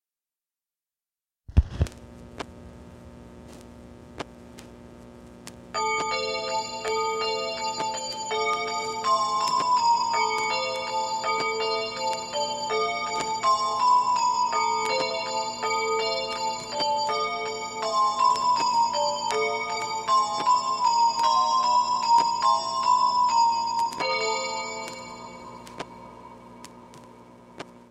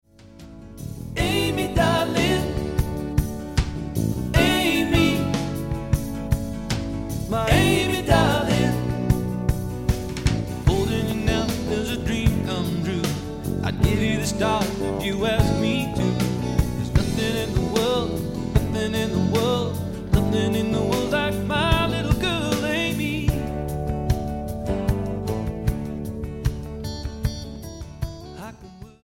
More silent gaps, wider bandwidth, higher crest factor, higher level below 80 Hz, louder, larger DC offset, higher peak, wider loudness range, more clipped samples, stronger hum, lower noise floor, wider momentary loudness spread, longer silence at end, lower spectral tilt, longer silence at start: neither; second, 13 kHz vs 17 kHz; about the same, 20 dB vs 20 dB; second, -42 dBFS vs -32 dBFS; about the same, -25 LUFS vs -23 LUFS; neither; about the same, -6 dBFS vs -4 dBFS; first, 11 LU vs 5 LU; neither; first, 60 Hz at -50 dBFS vs none; first, under -90 dBFS vs -44 dBFS; first, 19 LU vs 10 LU; about the same, 0.1 s vs 0.15 s; second, -2.5 dB/octave vs -5.5 dB/octave; first, 1.5 s vs 0.2 s